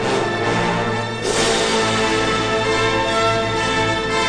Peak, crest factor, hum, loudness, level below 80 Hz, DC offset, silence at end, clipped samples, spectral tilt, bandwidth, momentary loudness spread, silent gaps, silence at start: -6 dBFS; 12 dB; none; -18 LUFS; -40 dBFS; under 0.1%; 0 s; under 0.1%; -3.5 dB/octave; 10 kHz; 3 LU; none; 0 s